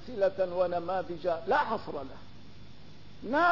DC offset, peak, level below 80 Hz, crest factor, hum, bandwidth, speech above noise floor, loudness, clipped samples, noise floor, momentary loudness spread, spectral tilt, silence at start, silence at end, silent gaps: 0.6%; -14 dBFS; -60 dBFS; 18 dB; 50 Hz at -55 dBFS; 6 kHz; 23 dB; -31 LUFS; under 0.1%; -52 dBFS; 19 LU; -6.5 dB/octave; 0 s; 0 s; none